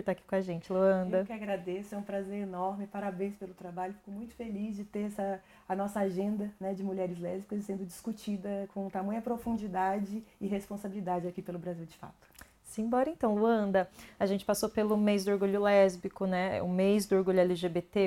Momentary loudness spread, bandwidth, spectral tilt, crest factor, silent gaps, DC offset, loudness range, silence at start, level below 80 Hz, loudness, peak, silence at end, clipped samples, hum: 12 LU; 16 kHz; -6.5 dB/octave; 18 dB; none; under 0.1%; 9 LU; 0 s; -64 dBFS; -33 LUFS; -14 dBFS; 0 s; under 0.1%; none